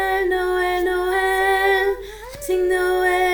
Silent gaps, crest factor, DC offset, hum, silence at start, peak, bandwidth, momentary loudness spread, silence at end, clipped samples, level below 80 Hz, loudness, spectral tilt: none; 12 dB; under 0.1%; none; 0 s; -8 dBFS; 19 kHz; 8 LU; 0 s; under 0.1%; -42 dBFS; -19 LUFS; -3.5 dB/octave